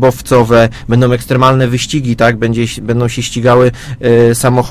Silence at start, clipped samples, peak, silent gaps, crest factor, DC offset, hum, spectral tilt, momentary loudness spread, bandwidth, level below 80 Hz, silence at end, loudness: 0 s; 0.7%; 0 dBFS; none; 10 dB; 0.6%; none; -6 dB/octave; 6 LU; 15.5 kHz; -34 dBFS; 0 s; -11 LUFS